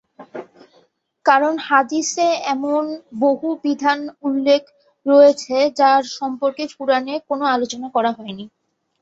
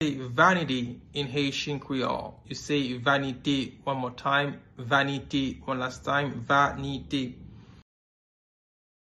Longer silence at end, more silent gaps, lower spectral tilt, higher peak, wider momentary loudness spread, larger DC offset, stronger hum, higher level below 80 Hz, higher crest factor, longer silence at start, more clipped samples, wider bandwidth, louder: second, 0.55 s vs 1.35 s; neither; second, -3 dB/octave vs -5 dB/octave; first, 0 dBFS vs -8 dBFS; first, 14 LU vs 11 LU; neither; neither; second, -68 dBFS vs -56 dBFS; about the same, 18 dB vs 22 dB; first, 0.2 s vs 0 s; neither; second, 8 kHz vs 11.5 kHz; first, -18 LUFS vs -28 LUFS